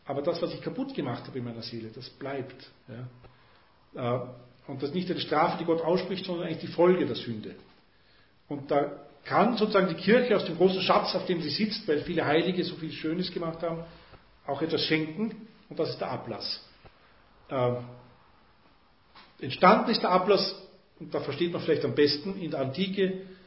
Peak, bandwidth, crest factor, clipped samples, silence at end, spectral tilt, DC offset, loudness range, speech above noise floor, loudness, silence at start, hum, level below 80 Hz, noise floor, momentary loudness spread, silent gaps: -4 dBFS; 5.8 kHz; 24 dB; under 0.1%; 0.1 s; -9.5 dB/octave; under 0.1%; 11 LU; 34 dB; -28 LUFS; 0.05 s; none; -64 dBFS; -62 dBFS; 18 LU; none